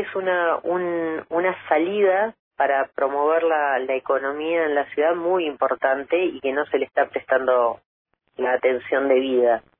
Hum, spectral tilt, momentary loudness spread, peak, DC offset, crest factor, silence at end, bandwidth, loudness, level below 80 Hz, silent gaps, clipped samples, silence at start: none; -8.5 dB/octave; 5 LU; -6 dBFS; under 0.1%; 16 dB; 0.2 s; 3.8 kHz; -22 LUFS; -68 dBFS; 2.39-2.51 s, 7.86-8.05 s; under 0.1%; 0 s